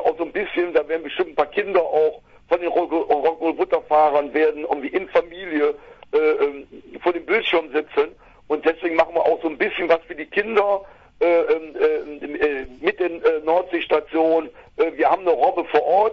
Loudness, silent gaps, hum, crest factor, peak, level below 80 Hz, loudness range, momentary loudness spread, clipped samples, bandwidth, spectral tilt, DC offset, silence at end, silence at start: -21 LUFS; none; none; 20 dB; -2 dBFS; -56 dBFS; 2 LU; 6 LU; under 0.1%; 6 kHz; -6 dB/octave; under 0.1%; 0 s; 0 s